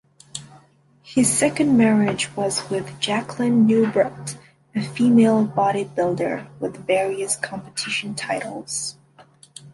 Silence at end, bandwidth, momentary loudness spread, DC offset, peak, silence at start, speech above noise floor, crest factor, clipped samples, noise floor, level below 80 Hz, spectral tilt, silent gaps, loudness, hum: 0.05 s; 12 kHz; 14 LU; under 0.1%; -6 dBFS; 0.35 s; 34 dB; 16 dB; under 0.1%; -55 dBFS; -60 dBFS; -4.5 dB/octave; none; -21 LUFS; none